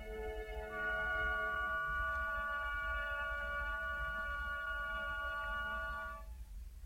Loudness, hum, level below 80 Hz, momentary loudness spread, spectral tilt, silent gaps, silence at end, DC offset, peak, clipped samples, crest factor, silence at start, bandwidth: -39 LUFS; none; -48 dBFS; 8 LU; -4.5 dB/octave; none; 0 s; under 0.1%; -26 dBFS; under 0.1%; 14 dB; 0 s; 16 kHz